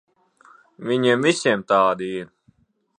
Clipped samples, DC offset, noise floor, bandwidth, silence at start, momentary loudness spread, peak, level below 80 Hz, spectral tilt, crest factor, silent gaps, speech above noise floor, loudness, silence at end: under 0.1%; under 0.1%; -61 dBFS; 10 kHz; 0.8 s; 15 LU; -4 dBFS; -68 dBFS; -4.5 dB/octave; 20 dB; none; 41 dB; -20 LUFS; 0.75 s